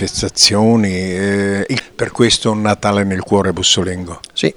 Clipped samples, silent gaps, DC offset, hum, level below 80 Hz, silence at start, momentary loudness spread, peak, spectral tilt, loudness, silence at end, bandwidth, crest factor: under 0.1%; none; under 0.1%; none; -42 dBFS; 0 s; 10 LU; 0 dBFS; -3.5 dB/octave; -14 LUFS; 0.05 s; over 20 kHz; 14 dB